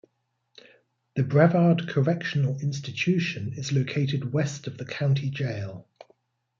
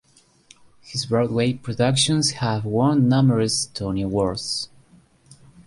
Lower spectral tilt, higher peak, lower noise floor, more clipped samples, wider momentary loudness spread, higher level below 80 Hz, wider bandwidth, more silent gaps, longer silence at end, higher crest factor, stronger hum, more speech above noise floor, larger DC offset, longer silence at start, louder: first, -7 dB/octave vs -5 dB/octave; about the same, -8 dBFS vs -6 dBFS; first, -75 dBFS vs -54 dBFS; neither; first, 14 LU vs 9 LU; second, -66 dBFS vs -50 dBFS; second, 7.4 kHz vs 11.5 kHz; neither; first, 0.75 s vs 0.05 s; about the same, 20 dB vs 16 dB; neither; first, 50 dB vs 34 dB; neither; first, 1.15 s vs 0.85 s; second, -26 LUFS vs -21 LUFS